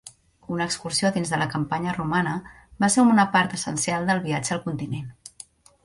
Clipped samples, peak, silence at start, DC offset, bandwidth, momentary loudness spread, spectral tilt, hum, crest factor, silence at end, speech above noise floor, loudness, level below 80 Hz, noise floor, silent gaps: under 0.1%; -6 dBFS; 0.05 s; under 0.1%; 11.5 kHz; 15 LU; -4.5 dB/octave; none; 18 dB; 0.55 s; 25 dB; -23 LUFS; -56 dBFS; -49 dBFS; none